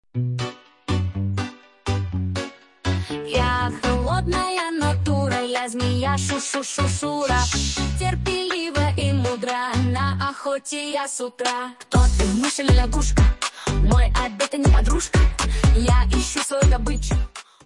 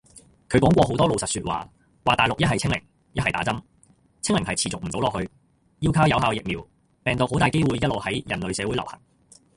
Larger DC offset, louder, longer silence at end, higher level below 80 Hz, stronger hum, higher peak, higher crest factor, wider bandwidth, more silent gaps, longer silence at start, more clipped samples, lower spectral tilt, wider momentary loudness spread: neither; about the same, -22 LUFS vs -23 LUFS; second, 0.25 s vs 0.6 s; first, -24 dBFS vs -44 dBFS; neither; about the same, -6 dBFS vs -4 dBFS; second, 14 dB vs 20 dB; about the same, 11.5 kHz vs 11.5 kHz; neither; about the same, 0.15 s vs 0.15 s; neither; about the same, -5 dB/octave vs -5 dB/octave; second, 8 LU vs 12 LU